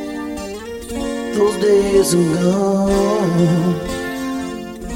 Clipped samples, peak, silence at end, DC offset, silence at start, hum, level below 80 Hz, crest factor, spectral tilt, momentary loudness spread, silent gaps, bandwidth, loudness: under 0.1%; -2 dBFS; 0 s; under 0.1%; 0 s; none; -38 dBFS; 14 dB; -6 dB/octave; 13 LU; none; 16.5 kHz; -17 LUFS